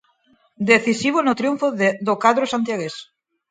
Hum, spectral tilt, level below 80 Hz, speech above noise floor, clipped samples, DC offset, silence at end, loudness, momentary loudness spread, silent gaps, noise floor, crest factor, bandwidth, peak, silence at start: none; -4.5 dB/octave; -66 dBFS; 41 dB; under 0.1%; under 0.1%; 0.45 s; -19 LUFS; 11 LU; none; -60 dBFS; 20 dB; 9.4 kHz; 0 dBFS; 0.6 s